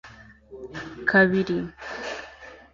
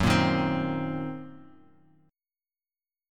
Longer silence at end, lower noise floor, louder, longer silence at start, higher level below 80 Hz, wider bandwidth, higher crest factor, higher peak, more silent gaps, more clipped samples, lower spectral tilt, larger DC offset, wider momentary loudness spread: second, 0.15 s vs 1.65 s; second, -48 dBFS vs under -90 dBFS; first, -23 LUFS vs -28 LUFS; about the same, 0.05 s vs 0 s; second, -56 dBFS vs -50 dBFS; second, 7.4 kHz vs 16 kHz; about the same, 20 dB vs 22 dB; about the same, -6 dBFS vs -8 dBFS; neither; neither; about the same, -6.5 dB/octave vs -6 dB/octave; neither; first, 24 LU vs 18 LU